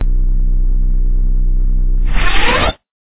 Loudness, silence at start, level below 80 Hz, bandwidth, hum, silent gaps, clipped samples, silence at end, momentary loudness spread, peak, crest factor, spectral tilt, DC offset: -17 LUFS; 0 s; -12 dBFS; 4 kHz; none; none; under 0.1%; 0.1 s; 6 LU; 0 dBFS; 12 dB; -8.5 dB/octave; under 0.1%